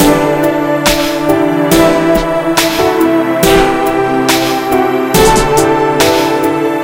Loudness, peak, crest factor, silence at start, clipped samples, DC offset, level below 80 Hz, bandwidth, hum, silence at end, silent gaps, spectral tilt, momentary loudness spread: -10 LUFS; 0 dBFS; 10 dB; 0 s; 0.3%; under 0.1%; -28 dBFS; 17.5 kHz; none; 0 s; none; -4 dB/octave; 4 LU